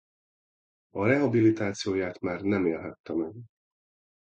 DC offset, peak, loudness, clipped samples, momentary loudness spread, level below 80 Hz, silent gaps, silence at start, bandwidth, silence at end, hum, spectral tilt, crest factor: under 0.1%; -10 dBFS; -28 LUFS; under 0.1%; 12 LU; -60 dBFS; 3.00-3.04 s; 0.95 s; 8.6 kHz; 0.75 s; none; -6.5 dB/octave; 18 dB